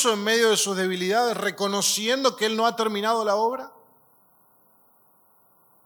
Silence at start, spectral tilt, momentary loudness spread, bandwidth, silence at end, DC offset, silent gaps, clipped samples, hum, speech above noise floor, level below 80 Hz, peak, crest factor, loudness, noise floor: 0 s; -2.5 dB/octave; 5 LU; 19 kHz; 2.15 s; under 0.1%; none; under 0.1%; none; 37 dB; -82 dBFS; -6 dBFS; 20 dB; -23 LUFS; -60 dBFS